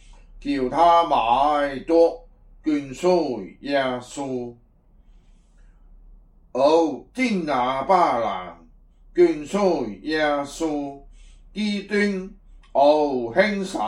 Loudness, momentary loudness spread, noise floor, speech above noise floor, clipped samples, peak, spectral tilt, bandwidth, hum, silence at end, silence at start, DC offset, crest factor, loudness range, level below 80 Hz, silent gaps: -22 LUFS; 14 LU; -54 dBFS; 33 dB; under 0.1%; -4 dBFS; -5.5 dB/octave; 11.5 kHz; none; 0 s; 0.1 s; under 0.1%; 18 dB; 6 LU; -50 dBFS; none